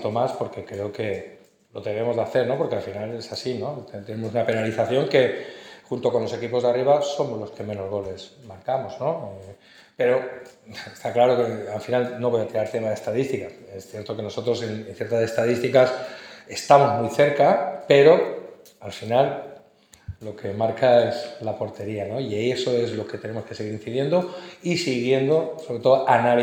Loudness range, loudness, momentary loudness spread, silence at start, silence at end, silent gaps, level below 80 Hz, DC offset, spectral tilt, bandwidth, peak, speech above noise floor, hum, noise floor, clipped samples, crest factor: 8 LU; -23 LUFS; 18 LU; 0 s; 0 s; none; -64 dBFS; under 0.1%; -6 dB/octave; 16 kHz; -2 dBFS; 31 dB; none; -54 dBFS; under 0.1%; 22 dB